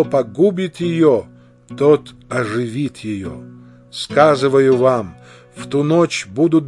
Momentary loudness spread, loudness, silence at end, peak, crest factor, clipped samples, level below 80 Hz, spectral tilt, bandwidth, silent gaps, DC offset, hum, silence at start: 16 LU; -16 LUFS; 0 s; 0 dBFS; 16 dB; under 0.1%; -56 dBFS; -6.5 dB/octave; 11.5 kHz; none; under 0.1%; none; 0 s